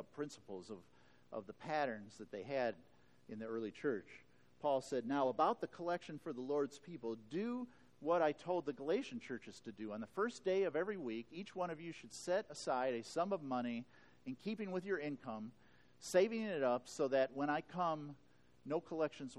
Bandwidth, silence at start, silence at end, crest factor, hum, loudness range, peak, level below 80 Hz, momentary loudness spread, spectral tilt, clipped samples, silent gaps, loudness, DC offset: 12 kHz; 0 s; 0 s; 20 dB; none; 5 LU; -20 dBFS; -82 dBFS; 15 LU; -5.5 dB/octave; under 0.1%; none; -41 LUFS; under 0.1%